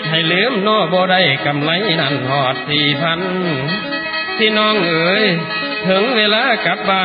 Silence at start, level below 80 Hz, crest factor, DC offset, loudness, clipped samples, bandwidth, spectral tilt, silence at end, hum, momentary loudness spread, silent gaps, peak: 0 s; -56 dBFS; 14 dB; under 0.1%; -15 LUFS; under 0.1%; 5.2 kHz; -9 dB/octave; 0 s; none; 6 LU; none; 0 dBFS